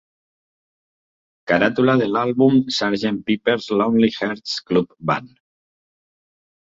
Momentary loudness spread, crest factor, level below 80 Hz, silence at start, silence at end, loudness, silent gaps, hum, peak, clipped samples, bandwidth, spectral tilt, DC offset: 8 LU; 20 dB; -58 dBFS; 1.45 s; 1.4 s; -19 LUFS; none; none; -2 dBFS; under 0.1%; 7.8 kHz; -6 dB/octave; under 0.1%